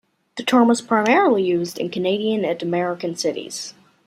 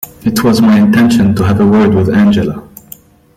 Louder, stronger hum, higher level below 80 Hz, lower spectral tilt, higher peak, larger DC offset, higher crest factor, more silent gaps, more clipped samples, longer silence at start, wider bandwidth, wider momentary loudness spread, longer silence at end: second, -20 LUFS vs -9 LUFS; neither; second, -68 dBFS vs -38 dBFS; second, -4.5 dB/octave vs -6.5 dB/octave; about the same, -2 dBFS vs 0 dBFS; neither; first, 18 dB vs 8 dB; neither; neither; first, 0.35 s vs 0 s; second, 14.5 kHz vs 16 kHz; first, 13 LU vs 7 LU; second, 0.35 s vs 0.75 s